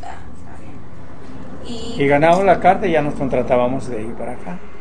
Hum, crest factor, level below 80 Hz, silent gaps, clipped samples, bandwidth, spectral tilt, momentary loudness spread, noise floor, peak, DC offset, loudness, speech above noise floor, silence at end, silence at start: none; 18 dB; -42 dBFS; none; under 0.1%; 10 kHz; -6.5 dB/octave; 25 LU; -38 dBFS; 0 dBFS; 6%; -17 LUFS; 21 dB; 0 s; 0 s